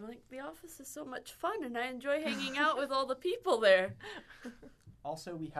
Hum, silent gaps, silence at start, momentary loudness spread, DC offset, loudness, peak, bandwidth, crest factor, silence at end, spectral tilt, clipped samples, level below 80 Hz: none; none; 0 s; 19 LU; under 0.1%; -33 LUFS; -14 dBFS; 13.5 kHz; 20 dB; 0 s; -3.5 dB/octave; under 0.1%; -70 dBFS